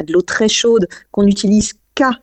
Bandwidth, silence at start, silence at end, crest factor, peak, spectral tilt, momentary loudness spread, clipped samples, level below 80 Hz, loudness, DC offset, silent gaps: 8.8 kHz; 0 s; 0.05 s; 12 dB; -2 dBFS; -4 dB/octave; 6 LU; under 0.1%; -42 dBFS; -14 LUFS; under 0.1%; none